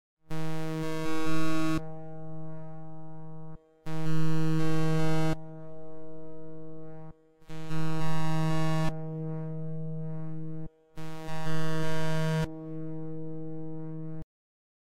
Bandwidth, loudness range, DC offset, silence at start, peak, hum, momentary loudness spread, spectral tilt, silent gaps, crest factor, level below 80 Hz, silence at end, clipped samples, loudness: 15 kHz; 3 LU; under 0.1%; 0.15 s; -14 dBFS; none; 17 LU; -7 dB/octave; none; 12 dB; -52 dBFS; 0.7 s; under 0.1%; -34 LUFS